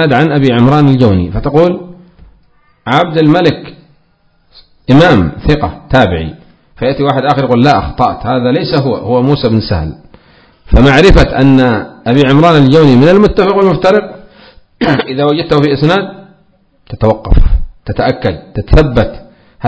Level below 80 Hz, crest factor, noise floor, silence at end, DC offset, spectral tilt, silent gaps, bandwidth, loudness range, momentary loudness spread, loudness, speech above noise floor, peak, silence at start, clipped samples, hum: -20 dBFS; 10 dB; -52 dBFS; 0 s; under 0.1%; -7.5 dB/octave; none; 8 kHz; 6 LU; 11 LU; -9 LUFS; 44 dB; 0 dBFS; 0 s; 4%; none